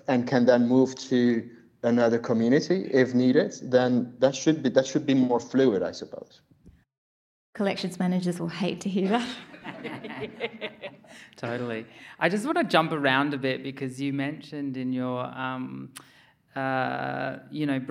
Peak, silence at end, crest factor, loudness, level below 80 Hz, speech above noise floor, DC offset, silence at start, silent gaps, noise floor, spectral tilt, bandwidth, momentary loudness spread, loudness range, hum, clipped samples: -6 dBFS; 0 s; 20 dB; -26 LUFS; -72 dBFS; over 64 dB; under 0.1%; 0.1 s; 6.98-7.53 s; under -90 dBFS; -6 dB/octave; 12 kHz; 15 LU; 8 LU; none; under 0.1%